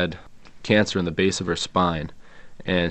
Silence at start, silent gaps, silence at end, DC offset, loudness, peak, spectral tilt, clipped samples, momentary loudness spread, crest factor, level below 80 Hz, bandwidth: 0 s; none; 0 s; under 0.1%; -23 LUFS; -2 dBFS; -5 dB/octave; under 0.1%; 17 LU; 22 dB; -48 dBFS; 9 kHz